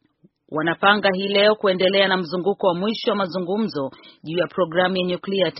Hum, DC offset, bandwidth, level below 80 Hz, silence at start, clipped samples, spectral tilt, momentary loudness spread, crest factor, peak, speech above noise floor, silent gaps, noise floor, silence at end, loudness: none; under 0.1%; 6 kHz; -64 dBFS; 0.5 s; under 0.1%; -2.5 dB/octave; 9 LU; 20 dB; 0 dBFS; 38 dB; none; -59 dBFS; 0 s; -20 LUFS